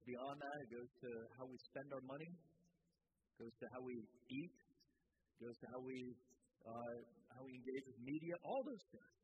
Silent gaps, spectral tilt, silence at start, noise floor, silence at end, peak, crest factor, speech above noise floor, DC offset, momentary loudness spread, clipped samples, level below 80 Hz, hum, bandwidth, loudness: none; -5.5 dB/octave; 0 s; -89 dBFS; 0.15 s; -36 dBFS; 18 dB; 36 dB; under 0.1%; 12 LU; under 0.1%; -90 dBFS; none; 8 kHz; -53 LUFS